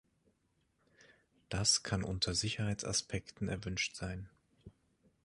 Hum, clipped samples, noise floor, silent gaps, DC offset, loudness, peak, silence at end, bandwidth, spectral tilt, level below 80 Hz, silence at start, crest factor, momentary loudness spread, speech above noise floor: none; under 0.1%; -78 dBFS; none; under 0.1%; -35 LUFS; -16 dBFS; 0.55 s; 11.5 kHz; -3 dB/octave; -56 dBFS; 1.5 s; 22 dB; 13 LU; 41 dB